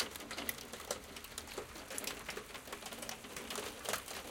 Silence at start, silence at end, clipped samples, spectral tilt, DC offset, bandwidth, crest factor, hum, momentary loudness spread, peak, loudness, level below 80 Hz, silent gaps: 0 s; 0 s; under 0.1%; -1.5 dB/octave; under 0.1%; 17 kHz; 26 dB; none; 6 LU; -18 dBFS; -43 LUFS; -64 dBFS; none